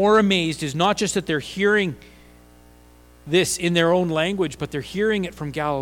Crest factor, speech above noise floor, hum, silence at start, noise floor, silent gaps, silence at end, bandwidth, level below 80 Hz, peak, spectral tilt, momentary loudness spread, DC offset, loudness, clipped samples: 16 dB; 29 dB; 60 Hz at -45 dBFS; 0 s; -50 dBFS; none; 0 s; 17.5 kHz; -50 dBFS; -6 dBFS; -4.5 dB/octave; 9 LU; under 0.1%; -21 LUFS; under 0.1%